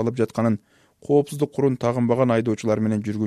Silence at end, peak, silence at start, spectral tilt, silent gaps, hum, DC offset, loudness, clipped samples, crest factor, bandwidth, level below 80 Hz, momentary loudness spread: 0 s; -6 dBFS; 0 s; -7.5 dB/octave; none; none; under 0.1%; -22 LUFS; under 0.1%; 16 dB; 13.5 kHz; -60 dBFS; 5 LU